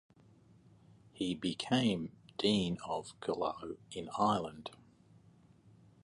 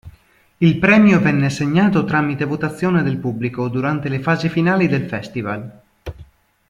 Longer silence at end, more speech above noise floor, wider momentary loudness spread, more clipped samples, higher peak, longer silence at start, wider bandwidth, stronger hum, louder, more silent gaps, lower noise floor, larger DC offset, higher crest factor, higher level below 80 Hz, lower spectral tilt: first, 1.3 s vs 0.45 s; second, 28 dB vs 36 dB; about the same, 13 LU vs 15 LU; neither; second, -18 dBFS vs 0 dBFS; first, 1.15 s vs 0.05 s; about the same, 11.5 kHz vs 10.5 kHz; neither; second, -36 LUFS vs -17 LUFS; neither; first, -63 dBFS vs -52 dBFS; neither; about the same, 20 dB vs 18 dB; second, -66 dBFS vs -48 dBFS; second, -5.5 dB/octave vs -7.5 dB/octave